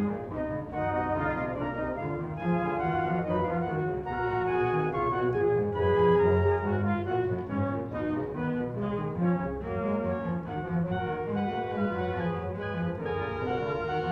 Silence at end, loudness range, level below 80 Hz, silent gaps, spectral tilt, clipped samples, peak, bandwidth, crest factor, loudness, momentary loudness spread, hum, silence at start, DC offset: 0 s; 5 LU; -52 dBFS; none; -9.5 dB/octave; under 0.1%; -12 dBFS; 5.4 kHz; 16 dB; -29 LUFS; 6 LU; none; 0 s; under 0.1%